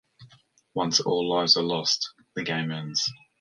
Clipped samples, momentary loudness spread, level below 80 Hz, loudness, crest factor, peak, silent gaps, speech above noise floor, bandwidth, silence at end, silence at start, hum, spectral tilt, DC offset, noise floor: under 0.1%; 11 LU; -66 dBFS; -25 LUFS; 22 dB; -6 dBFS; none; 33 dB; 11 kHz; 0.25 s; 0.2 s; none; -3 dB/octave; under 0.1%; -59 dBFS